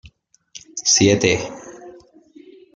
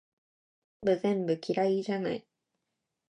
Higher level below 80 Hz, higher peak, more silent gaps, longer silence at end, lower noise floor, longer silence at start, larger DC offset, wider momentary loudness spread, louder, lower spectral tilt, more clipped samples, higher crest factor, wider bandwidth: first, -54 dBFS vs -72 dBFS; first, -2 dBFS vs -14 dBFS; neither; about the same, 0.85 s vs 0.9 s; second, -51 dBFS vs -85 dBFS; second, 0.55 s vs 0.8 s; neither; first, 23 LU vs 6 LU; first, -16 LUFS vs -31 LUFS; second, -3 dB/octave vs -7 dB/octave; neither; about the same, 20 dB vs 18 dB; about the same, 11 kHz vs 10 kHz